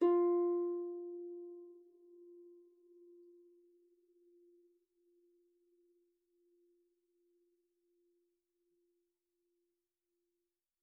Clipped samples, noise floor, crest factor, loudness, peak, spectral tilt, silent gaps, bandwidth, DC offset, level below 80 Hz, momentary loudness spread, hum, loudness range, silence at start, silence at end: under 0.1%; under -90 dBFS; 20 dB; -37 LUFS; -22 dBFS; -1 dB/octave; none; 2.4 kHz; under 0.1%; under -90 dBFS; 27 LU; none; 27 LU; 0 s; 8.3 s